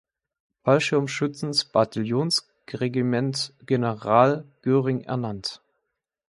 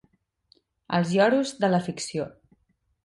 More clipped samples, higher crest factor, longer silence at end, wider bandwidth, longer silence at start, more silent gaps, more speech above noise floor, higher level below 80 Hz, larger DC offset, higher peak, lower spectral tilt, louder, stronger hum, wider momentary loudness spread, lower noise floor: neither; about the same, 22 dB vs 18 dB; about the same, 0.75 s vs 0.75 s; about the same, 11.5 kHz vs 11.5 kHz; second, 0.65 s vs 0.9 s; neither; first, 57 dB vs 47 dB; about the same, -64 dBFS vs -66 dBFS; neither; first, -2 dBFS vs -8 dBFS; about the same, -5.5 dB/octave vs -5.5 dB/octave; about the same, -24 LUFS vs -25 LUFS; neither; about the same, 10 LU vs 11 LU; first, -80 dBFS vs -71 dBFS